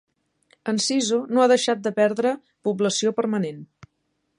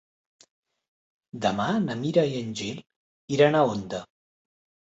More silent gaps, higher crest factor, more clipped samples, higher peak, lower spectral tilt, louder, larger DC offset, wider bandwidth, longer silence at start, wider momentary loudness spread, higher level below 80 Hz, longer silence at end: second, none vs 2.96-3.28 s; about the same, 18 dB vs 20 dB; neither; about the same, -6 dBFS vs -8 dBFS; second, -4 dB/octave vs -6 dB/octave; first, -22 LUFS vs -25 LUFS; neither; first, 11 kHz vs 8.2 kHz; second, 0.65 s vs 1.35 s; second, 10 LU vs 16 LU; second, -72 dBFS vs -64 dBFS; about the same, 0.75 s vs 0.85 s